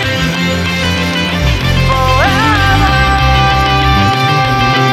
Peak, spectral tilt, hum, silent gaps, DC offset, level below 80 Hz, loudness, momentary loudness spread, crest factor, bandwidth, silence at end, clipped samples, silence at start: 0 dBFS; -5 dB/octave; none; none; under 0.1%; -20 dBFS; -10 LUFS; 4 LU; 10 dB; 16 kHz; 0 s; under 0.1%; 0 s